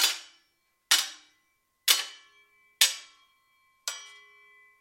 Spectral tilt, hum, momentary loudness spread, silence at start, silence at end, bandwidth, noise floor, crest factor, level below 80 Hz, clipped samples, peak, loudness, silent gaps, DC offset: 5.5 dB/octave; none; 17 LU; 0 s; 0.75 s; 16.5 kHz; -73 dBFS; 28 dB; under -90 dBFS; under 0.1%; -4 dBFS; -26 LUFS; none; under 0.1%